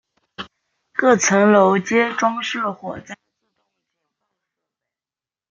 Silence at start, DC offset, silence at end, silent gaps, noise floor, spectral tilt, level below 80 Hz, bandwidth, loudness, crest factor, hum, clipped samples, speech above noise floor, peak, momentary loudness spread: 0.4 s; under 0.1%; 2.4 s; none; under -90 dBFS; -4 dB/octave; -66 dBFS; 7.6 kHz; -17 LUFS; 18 dB; none; under 0.1%; over 73 dB; -2 dBFS; 22 LU